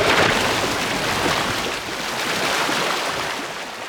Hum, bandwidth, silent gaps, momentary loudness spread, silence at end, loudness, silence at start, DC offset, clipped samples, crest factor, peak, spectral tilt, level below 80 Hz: none; over 20 kHz; none; 8 LU; 0 s; -20 LUFS; 0 s; under 0.1%; under 0.1%; 18 dB; -4 dBFS; -2.5 dB/octave; -46 dBFS